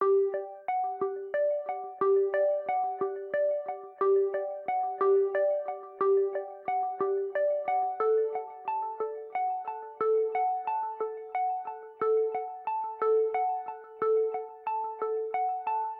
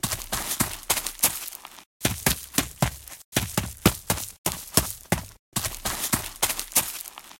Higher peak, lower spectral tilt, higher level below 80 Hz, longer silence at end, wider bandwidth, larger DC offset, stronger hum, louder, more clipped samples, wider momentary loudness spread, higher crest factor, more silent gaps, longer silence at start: second, -16 dBFS vs -2 dBFS; first, -8.5 dB/octave vs -2.5 dB/octave; second, -86 dBFS vs -44 dBFS; about the same, 0 s vs 0.05 s; second, 3.9 kHz vs 17 kHz; neither; neither; second, -30 LUFS vs -26 LUFS; neither; about the same, 9 LU vs 9 LU; second, 14 dB vs 26 dB; second, none vs 1.86-2.00 s, 3.24-3.32 s, 4.38-4.44 s, 5.39-5.52 s; about the same, 0 s vs 0.05 s